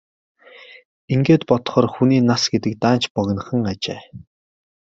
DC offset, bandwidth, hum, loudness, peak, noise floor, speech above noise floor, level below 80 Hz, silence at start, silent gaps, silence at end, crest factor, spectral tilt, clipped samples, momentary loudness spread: under 0.1%; 7.8 kHz; none; -19 LUFS; -2 dBFS; -44 dBFS; 26 dB; -56 dBFS; 1.1 s; 3.10-3.15 s; 0.65 s; 18 dB; -6 dB/octave; under 0.1%; 8 LU